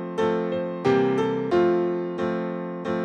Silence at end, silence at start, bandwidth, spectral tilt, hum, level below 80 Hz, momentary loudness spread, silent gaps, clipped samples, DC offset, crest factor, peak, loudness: 0 s; 0 s; 8.4 kHz; -7.5 dB/octave; none; -62 dBFS; 8 LU; none; under 0.1%; under 0.1%; 14 dB; -8 dBFS; -24 LUFS